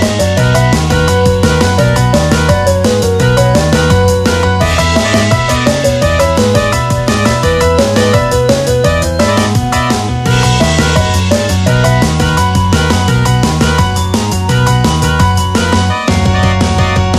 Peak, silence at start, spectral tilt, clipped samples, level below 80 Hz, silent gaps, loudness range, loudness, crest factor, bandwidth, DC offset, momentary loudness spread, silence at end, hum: 0 dBFS; 0 s; -5 dB/octave; under 0.1%; -22 dBFS; none; 1 LU; -10 LUFS; 10 dB; 15.5 kHz; under 0.1%; 2 LU; 0 s; none